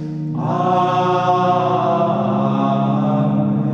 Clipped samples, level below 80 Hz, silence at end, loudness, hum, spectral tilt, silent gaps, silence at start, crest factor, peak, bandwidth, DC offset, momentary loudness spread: under 0.1%; -56 dBFS; 0 s; -17 LUFS; none; -8.5 dB/octave; none; 0 s; 12 dB; -4 dBFS; 7 kHz; under 0.1%; 3 LU